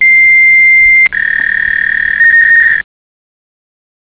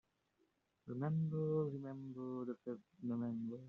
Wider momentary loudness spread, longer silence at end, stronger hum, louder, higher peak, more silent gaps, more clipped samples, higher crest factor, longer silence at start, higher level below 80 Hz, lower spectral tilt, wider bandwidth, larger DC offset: second, 7 LU vs 11 LU; first, 1.35 s vs 0 s; neither; first, -5 LUFS vs -43 LUFS; first, -2 dBFS vs -28 dBFS; neither; neither; second, 8 dB vs 16 dB; second, 0 s vs 0.85 s; first, -42 dBFS vs -80 dBFS; second, -3 dB/octave vs -11 dB/octave; about the same, 4 kHz vs 4 kHz; first, 0.5% vs under 0.1%